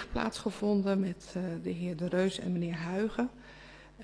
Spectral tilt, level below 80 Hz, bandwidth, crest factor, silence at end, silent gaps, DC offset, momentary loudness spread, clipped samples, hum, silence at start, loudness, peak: -6.5 dB/octave; -54 dBFS; 11 kHz; 16 dB; 0 s; none; under 0.1%; 13 LU; under 0.1%; none; 0 s; -33 LUFS; -16 dBFS